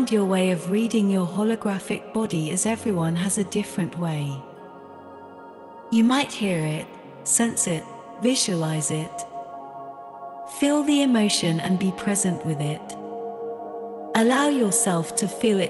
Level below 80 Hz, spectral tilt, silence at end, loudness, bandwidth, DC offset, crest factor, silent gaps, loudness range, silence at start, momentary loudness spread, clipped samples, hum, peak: -64 dBFS; -4.5 dB/octave; 0 s; -23 LUFS; 12.5 kHz; under 0.1%; 18 dB; none; 3 LU; 0 s; 19 LU; under 0.1%; none; -6 dBFS